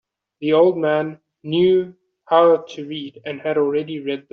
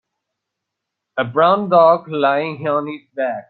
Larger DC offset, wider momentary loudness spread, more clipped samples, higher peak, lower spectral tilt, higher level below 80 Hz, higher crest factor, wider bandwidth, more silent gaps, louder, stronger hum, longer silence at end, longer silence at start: neither; first, 15 LU vs 12 LU; neither; about the same, -2 dBFS vs -2 dBFS; second, -4.5 dB/octave vs -9.5 dB/octave; about the same, -66 dBFS vs -66 dBFS; about the same, 16 dB vs 16 dB; first, 6.6 kHz vs 4.5 kHz; neither; second, -19 LUFS vs -16 LUFS; neither; about the same, 0.1 s vs 0.1 s; second, 0.4 s vs 1.15 s